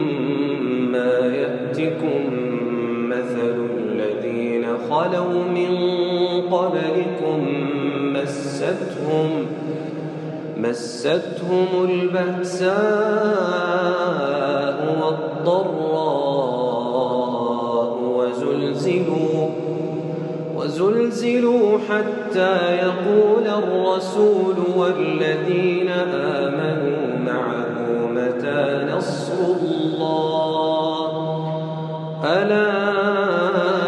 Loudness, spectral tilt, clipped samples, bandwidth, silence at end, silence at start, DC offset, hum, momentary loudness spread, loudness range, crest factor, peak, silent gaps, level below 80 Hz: -21 LUFS; -6.5 dB/octave; under 0.1%; 10.5 kHz; 0 s; 0 s; under 0.1%; none; 6 LU; 4 LU; 16 dB; -4 dBFS; none; -74 dBFS